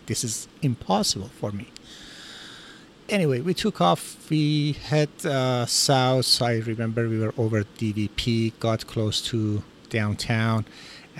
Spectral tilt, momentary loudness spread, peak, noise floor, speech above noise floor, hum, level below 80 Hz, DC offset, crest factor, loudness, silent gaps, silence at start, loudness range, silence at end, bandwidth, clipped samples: -4.5 dB/octave; 20 LU; -6 dBFS; -47 dBFS; 23 dB; none; -52 dBFS; under 0.1%; 18 dB; -24 LUFS; none; 0.05 s; 5 LU; 0 s; 16 kHz; under 0.1%